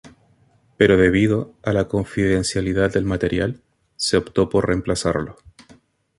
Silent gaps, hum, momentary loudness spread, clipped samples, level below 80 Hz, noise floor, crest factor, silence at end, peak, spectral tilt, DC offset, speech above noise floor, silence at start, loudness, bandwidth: none; none; 9 LU; under 0.1%; -40 dBFS; -58 dBFS; 20 dB; 0.85 s; -2 dBFS; -5.5 dB/octave; under 0.1%; 39 dB; 0.05 s; -20 LUFS; 11.5 kHz